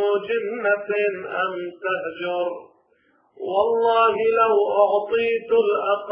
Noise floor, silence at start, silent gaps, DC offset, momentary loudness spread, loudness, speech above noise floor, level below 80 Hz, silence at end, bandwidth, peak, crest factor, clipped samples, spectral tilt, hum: -62 dBFS; 0 s; none; under 0.1%; 9 LU; -21 LUFS; 41 dB; -66 dBFS; 0 s; 5 kHz; -4 dBFS; 18 dB; under 0.1%; -8 dB/octave; none